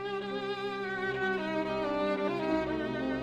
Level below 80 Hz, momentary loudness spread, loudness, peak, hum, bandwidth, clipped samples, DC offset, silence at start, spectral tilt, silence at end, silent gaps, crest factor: -58 dBFS; 4 LU; -32 LUFS; -18 dBFS; none; 9.4 kHz; under 0.1%; under 0.1%; 0 s; -6.5 dB/octave; 0 s; none; 14 dB